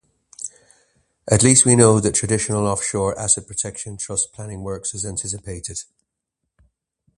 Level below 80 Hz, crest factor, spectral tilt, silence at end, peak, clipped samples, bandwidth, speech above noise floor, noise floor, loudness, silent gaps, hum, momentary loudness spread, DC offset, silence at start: -46 dBFS; 22 dB; -4 dB/octave; 1.35 s; 0 dBFS; under 0.1%; 11.5 kHz; 60 dB; -80 dBFS; -18 LUFS; none; none; 20 LU; under 0.1%; 0.4 s